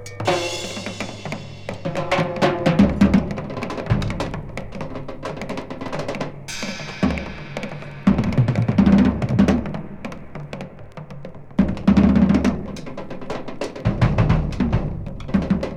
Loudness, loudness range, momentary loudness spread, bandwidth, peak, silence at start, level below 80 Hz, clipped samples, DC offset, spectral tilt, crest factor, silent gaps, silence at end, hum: -21 LUFS; 8 LU; 17 LU; 11 kHz; -2 dBFS; 0 s; -34 dBFS; under 0.1%; under 0.1%; -7 dB/octave; 18 dB; none; 0 s; none